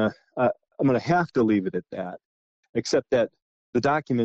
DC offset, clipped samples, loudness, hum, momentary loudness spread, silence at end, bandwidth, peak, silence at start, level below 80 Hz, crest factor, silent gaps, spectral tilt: under 0.1%; under 0.1%; -25 LUFS; none; 11 LU; 0 s; 8.6 kHz; -12 dBFS; 0 s; -60 dBFS; 12 dB; 2.25-2.63 s, 2.69-2.73 s, 3.42-3.73 s; -6.5 dB/octave